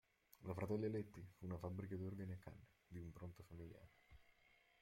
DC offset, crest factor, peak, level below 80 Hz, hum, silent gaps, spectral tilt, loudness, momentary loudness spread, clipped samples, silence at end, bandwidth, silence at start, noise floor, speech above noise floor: under 0.1%; 18 dB; -32 dBFS; -72 dBFS; none; none; -8.5 dB/octave; -51 LUFS; 16 LU; under 0.1%; 0.5 s; 16.5 kHz; 0.4 s; -76 dBFS; 26 dB